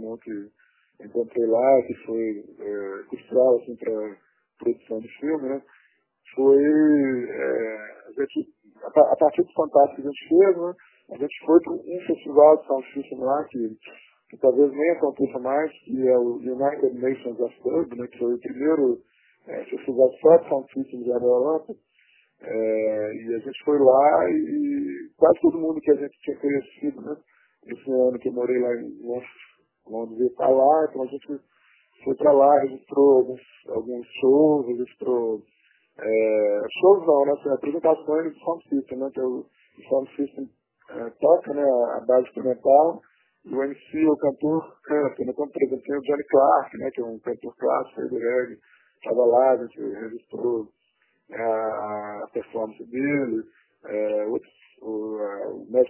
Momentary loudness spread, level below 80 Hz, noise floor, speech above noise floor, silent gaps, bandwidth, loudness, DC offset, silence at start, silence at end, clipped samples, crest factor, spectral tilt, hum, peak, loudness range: 16 LU; -70 dBFS; -69 dBFS; 47 dB; none; 3.2 kHz; -23 LUFS; under 0.1%; 0 s; 0 s; under 0.1%; 20 dB; -10.5 dB/octave; none; -2 dBFS; 6 LU